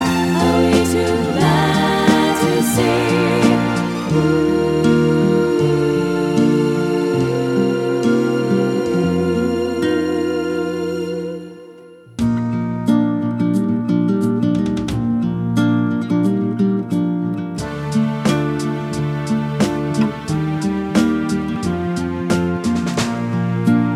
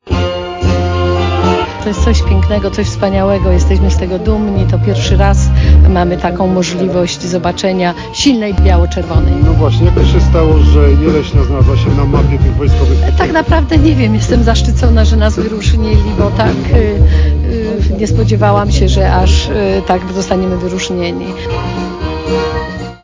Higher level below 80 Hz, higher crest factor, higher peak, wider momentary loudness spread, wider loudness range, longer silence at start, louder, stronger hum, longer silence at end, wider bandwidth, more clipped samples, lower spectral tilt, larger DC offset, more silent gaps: second, -42 dBFS vs -12 dBFS; first, 16 dB vs 10 dB; about the same, 0 dBFS vs 0 dBFS; about the same, 7 LU vs 7 LU; about the same, 5 LU vs 3 LU; about the same, 0 s vs 0.05 s; second, -17 LUFS vs -11 LUFS; neither; about the same, 0 s vs 0.05 s; first, 16.5 kHz vs 7.6 kHz; second, under 0.1% vs 0.8%; about the same, -6.5 dB/octave vs -6.5 dB/octave; neither; neither